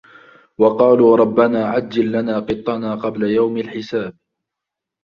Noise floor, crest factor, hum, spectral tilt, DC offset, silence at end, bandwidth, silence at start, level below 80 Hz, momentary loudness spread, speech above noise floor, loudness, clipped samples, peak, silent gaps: -83 dBFS; 16 dB; none; -8 dB/octave; under 0.1%; 0.95 s; 6.8 kHz; 0.6 s; -54 dBFS; 12 LU; 67 dB; -17 LUFS; under 0.1%; 0 dBFS; none